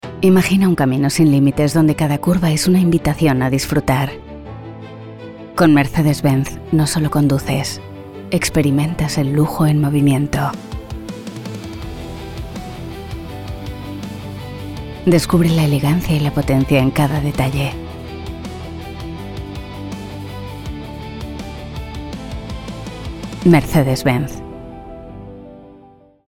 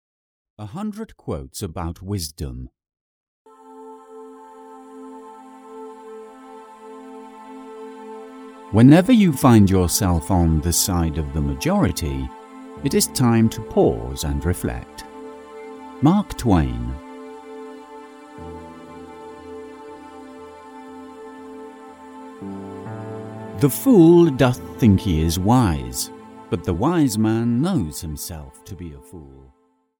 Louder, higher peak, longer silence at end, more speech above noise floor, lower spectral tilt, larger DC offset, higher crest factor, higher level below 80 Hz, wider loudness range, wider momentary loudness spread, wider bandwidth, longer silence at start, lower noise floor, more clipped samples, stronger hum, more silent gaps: first, -16 LUFS vs -19 LUFS; about the same, 0 dBFS vs 0 dBFS; second, 0.45 s vs 0.75 s; first, 32 dB vs 24 dB; about the same, -6.5 dB/octave vs -6 dB/octave; neither; about the same, 18 dB vs 20 dB; about the same, -36 dBFS vs -36 dBFS; second, 14 LU vs 22 LU; second, 17 LU vs 25 LU; second, 17.5 kHz vs over 20 kHz; second, 0.05 s vs 0.6 s; first, -46 dBFS vs -42 dBFS; neither; neither; second, none vs 3.01-3.45 s